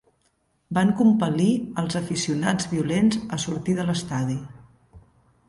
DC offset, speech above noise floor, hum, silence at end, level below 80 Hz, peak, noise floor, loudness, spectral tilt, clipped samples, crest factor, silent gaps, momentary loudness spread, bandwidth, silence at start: under 0.1%; 46 dB; none; 0.5 s; -54 dBFS; -8 dBFS; -68 dBFS; -23 LUFS; -5.5 dB/octave; under 0.1%; 16 dB; none; 9 LU; 11.5 kHz; 0.7 s